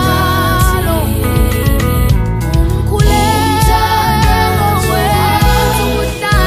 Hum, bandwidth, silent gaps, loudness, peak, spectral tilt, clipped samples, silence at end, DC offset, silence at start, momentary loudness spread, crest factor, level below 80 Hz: none; 15.5 kHz; none; -12 LUFS; 0 dBFS; -5 dB/octave; under 0.1%; 0 s; under 0.1%; 0 s; 3 LU; 10 dB; -16 dBFS